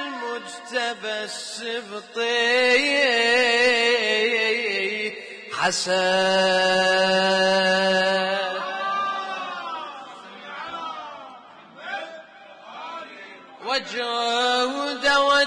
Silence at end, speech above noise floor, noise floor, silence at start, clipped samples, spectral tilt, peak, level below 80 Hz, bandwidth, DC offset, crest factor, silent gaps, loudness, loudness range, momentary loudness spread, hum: 0 s; 24 dB; -45 dBFS; 0 s; under 0.1%; -2.5 dB/octave; -8 dBFS; -64 dBFS; 10.5 kHz; under 0.1%; 16 dB; none; -21 LUFS; 15 LU; 19 LU; none